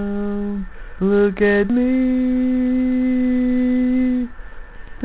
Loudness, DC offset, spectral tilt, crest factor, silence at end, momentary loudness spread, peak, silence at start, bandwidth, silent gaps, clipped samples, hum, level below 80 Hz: -18 LUFS; 0.4%; -11.5 dB/octave; 12 dB; 0 s; 9 LU; -6 dBFS; 0 s; 4 kHz; none; under 0.1%; none; -38 dBFS